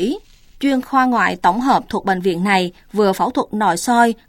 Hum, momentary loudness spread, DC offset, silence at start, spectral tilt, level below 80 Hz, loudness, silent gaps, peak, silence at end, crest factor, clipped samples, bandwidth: none; 6 LU; under 0.1%; 0 s; -5 dB/octave; -48 dBFS; -17 LUFS; none; -2 dBFS; 0.15 s; 16 dB; under 0.1%; 17 kHz